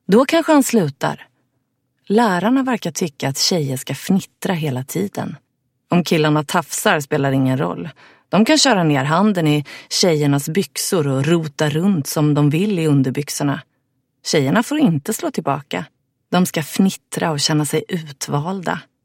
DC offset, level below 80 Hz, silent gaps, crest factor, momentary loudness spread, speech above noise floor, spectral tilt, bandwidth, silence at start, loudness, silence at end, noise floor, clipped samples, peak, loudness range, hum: under 0.1%; -62 dBFS; none; 18 dB; 10 LU; 52 dB; -5 dB/octave; 16.5 kHz; 0.1 s; -18 LUFS; 0.2 s; -69 dBFS; under 0.1%; 0 dBFS; 4 LU; none